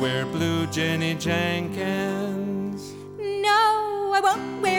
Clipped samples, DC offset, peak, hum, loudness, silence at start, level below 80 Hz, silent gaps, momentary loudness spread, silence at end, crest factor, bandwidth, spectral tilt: under 0.1%; under 0.1%; -10 dBFS; none; -24 LUFS; 0 s; -62 dBFS; none; 11 LU; 0 s; 14 dB; over 20 kHz; -5 dB/octave